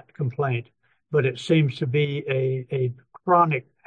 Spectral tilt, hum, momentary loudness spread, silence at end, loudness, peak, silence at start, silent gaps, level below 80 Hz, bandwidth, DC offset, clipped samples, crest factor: -7.5 dB/octave; none; 10 LU; 0.25 s; -24 LUFS; -6 dBFS; 0.2 s; none; -68 dBFS; 9 kHz; under 0.1%; under 0.1%; 18 dB